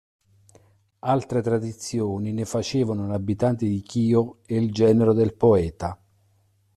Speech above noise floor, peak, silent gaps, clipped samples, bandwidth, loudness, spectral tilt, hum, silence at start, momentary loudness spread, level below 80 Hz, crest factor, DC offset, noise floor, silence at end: 42 dB; -6 dBFS; none; under 0.1%; 12.5 kHz; -23 LUFS; -7.5 dB/octave; none; 1.05 s; 9 LU; -54 dBFS; 18 dB; under 0.1%; -64 dBFS; 0.8 s